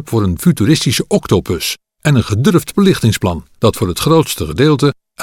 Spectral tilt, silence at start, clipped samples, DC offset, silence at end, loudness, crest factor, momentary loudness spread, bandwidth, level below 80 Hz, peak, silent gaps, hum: -5.5 dB/octave; 0 s; under 0.1%; under 0.1%; 0 s; -14 LUFS; 12 dB; 6 LU; 17 kHz; -36 dBFS; 0 dBFS; none; none